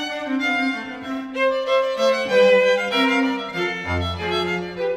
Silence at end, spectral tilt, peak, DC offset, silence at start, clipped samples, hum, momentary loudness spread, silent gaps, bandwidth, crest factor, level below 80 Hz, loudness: 0 s; -5 dB/octave; -4 dBFS; under 0.1%; 0 s; under 0.1%; none; 9 LU; none; 14 kHz; 16 dB; -48 dBFS; -20 LUFS